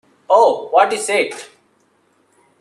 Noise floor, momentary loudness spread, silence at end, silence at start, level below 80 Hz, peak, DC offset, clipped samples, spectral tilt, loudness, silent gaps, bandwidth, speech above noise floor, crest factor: -59 dBFS; 9 LU; 1.15 s; 0.3 s; -72 dBFS; 0 dBFS; under 0.1%; under 0.1%; -1.5 dB/octave; -15 LUFS; none; 13 kHz; 44 dB; 18 dB